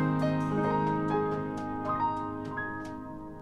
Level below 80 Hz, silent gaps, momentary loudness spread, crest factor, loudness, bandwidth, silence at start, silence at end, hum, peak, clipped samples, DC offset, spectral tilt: -54 dBFS; none; 11 LU; 14 dB; -31 LUFS; 10 kHz; 0 s; 0 s; none; -16 dBFS; under 0.1%; under 0.1%; -8 dB/octave